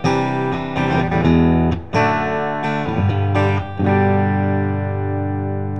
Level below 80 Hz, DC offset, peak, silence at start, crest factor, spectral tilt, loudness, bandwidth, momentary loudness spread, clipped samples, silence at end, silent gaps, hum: -36 dBFS; 1%; -2 dBFS; 0 s; 16 dB; -8 dB/octave; -18 LUFS; 7.8 kHz; 7 LU; under 0.1%; 0 s; none; 50 Hz at -35 dBFS